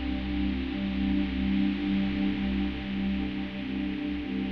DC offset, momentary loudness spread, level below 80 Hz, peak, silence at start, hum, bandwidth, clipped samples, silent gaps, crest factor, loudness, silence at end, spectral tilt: 0.2%; 5 LU; -40 dBFS; -16 dBFS; 0 s; none; 5.8 kHz; under 0.1%; none; 12 dB; -30 LUFS; 0 s; -8.5 dB/octave